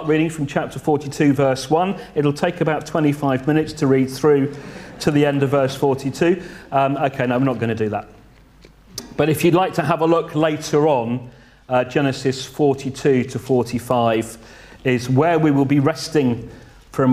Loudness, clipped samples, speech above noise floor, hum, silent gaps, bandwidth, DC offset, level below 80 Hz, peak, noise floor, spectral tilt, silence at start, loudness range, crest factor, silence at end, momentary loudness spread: -19 LUFS; under 0.1%; 29 dB; none; none; 15.5 kHz; under 0.1%; -50 dBFS; -2 dBFS; -47 dBFS; -6.5 dB/octave; 0 s; 2 LU; 18 dB; 0 s; 8 LU